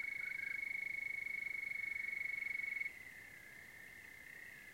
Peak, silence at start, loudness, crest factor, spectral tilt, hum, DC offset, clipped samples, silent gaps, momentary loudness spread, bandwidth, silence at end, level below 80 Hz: -30 dBFS; 0 s; -41 LUFS; 14 dB; -1.5 dB/octave; none; under 0.1%; under 0.1%; none; 14 LU; 16.5 kHz; 0 s; -78 dBFS